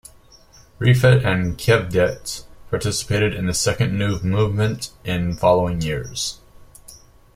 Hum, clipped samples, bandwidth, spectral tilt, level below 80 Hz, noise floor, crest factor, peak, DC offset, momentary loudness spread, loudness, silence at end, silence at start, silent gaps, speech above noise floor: none; under 0.1%; 16 kHz; -5 dB/octave; -42 dBFS; -49 dBFS; 20 dB; -2 dBFS; under 0.1%; 11 LU; -20 LUFS; 0.4 s; 0.8 s; none; 30 dB